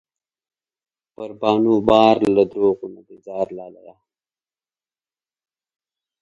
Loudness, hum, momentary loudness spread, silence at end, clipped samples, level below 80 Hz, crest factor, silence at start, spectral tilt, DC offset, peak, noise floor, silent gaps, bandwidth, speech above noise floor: -18 LUFS; none; 22 LU; 2.5 s; under 0.1%; -54 dBFS; 22 dB; 1.2 s; -7 dB/octave; under 0.1%; 0 dBFS; under -90 dBFS; none; 9.2 kHz; over 72 dB